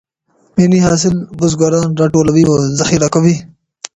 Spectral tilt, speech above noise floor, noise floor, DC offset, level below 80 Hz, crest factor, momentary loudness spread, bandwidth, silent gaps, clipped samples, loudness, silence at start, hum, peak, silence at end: -6 dB/octave; 45 dB; -56 dBFS; under 0.1%; -40 dBFS; 12 dB; 6 LU; 8.8 kHz; none; under 0.1%; -12 LUFS; 0.55 s; none; 0 dBFS; 0.5 s